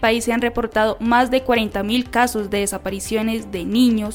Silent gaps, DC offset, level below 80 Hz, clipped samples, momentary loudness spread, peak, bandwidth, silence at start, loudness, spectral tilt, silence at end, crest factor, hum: none; under 0.1%; -40 dBFS; under 0.1%; 7 LU; -4 dBFS; 17 kHz; 0 s; -19 LUFS; -4 dB/octave; 0 s; 14 dB; none